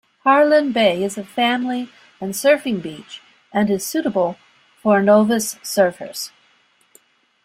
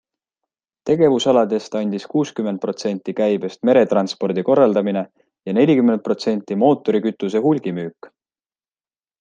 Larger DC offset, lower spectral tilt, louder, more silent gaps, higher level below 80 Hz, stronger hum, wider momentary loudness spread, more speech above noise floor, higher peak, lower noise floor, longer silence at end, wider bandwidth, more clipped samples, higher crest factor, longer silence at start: neither; second, -4 dB/octave vs -6.5 dB/octave; about the same, -18 LUFS vs -18 LUFS; neither; about the same, -64 dBFS vs -66 dBFS; neither; first, 18 LU vs 9 LU; second, 41 dB vs over 72 dB; about the same, -2 dBFS vs -2 dBFS; second, -58 dBFS vs under -90 dBFS; about the same, 1.15 s vs 1.15 s; first, 16 kHz vs 9.2 kHz; neither; about the same, 18 dB vs 16 dB; second, 0.25 s vs 0.85 s